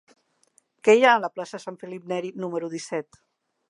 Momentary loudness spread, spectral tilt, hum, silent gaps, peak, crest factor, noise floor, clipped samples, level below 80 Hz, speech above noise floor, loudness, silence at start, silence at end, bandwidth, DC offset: 19 LU; -4 dB/octave; none; none; -4 dBFS; 22 dB; -65 dBFS; under 0.1%; -80 dBFS; 42 dB; -23 LUFS; 0.85 s; 0.65 s; 11 kHz; under 0.1%